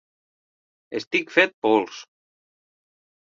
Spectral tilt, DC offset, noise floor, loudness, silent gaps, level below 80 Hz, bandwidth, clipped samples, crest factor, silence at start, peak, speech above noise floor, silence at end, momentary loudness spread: -4 dB/octave; under 0.1%; under -90 dBFS; -21 LUFS; 1.07-1.11 s, 1.54-1.62 s; -74 dBFS; 7.4 kHz; under 0.1%; 26 dB; 0.9 s; -2 dBFS; over 68 dB; 1.25 s; 15 LU